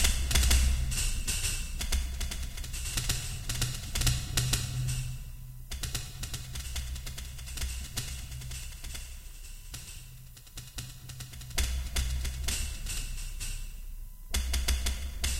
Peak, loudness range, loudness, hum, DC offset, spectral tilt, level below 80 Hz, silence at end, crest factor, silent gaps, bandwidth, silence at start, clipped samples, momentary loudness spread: -10 dBFS; 8 LU; -34 LUFS; none; under 0.1%; -2.5 dB/octave; -34 dBFS; 0 s; 22 dB; none; 16.5 kHz; 0 s; under 0.1%; 16 LU